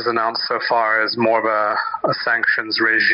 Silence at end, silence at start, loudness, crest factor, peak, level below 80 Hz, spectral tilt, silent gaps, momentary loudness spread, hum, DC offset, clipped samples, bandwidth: 0 s; 0 s; -18 LUFS; 12 dB; -6 dBFS; -66 dBFS; -0.5 dB/octave; none; 4 LU; none; under 0.1%; under 0.1%; 5.6 kHz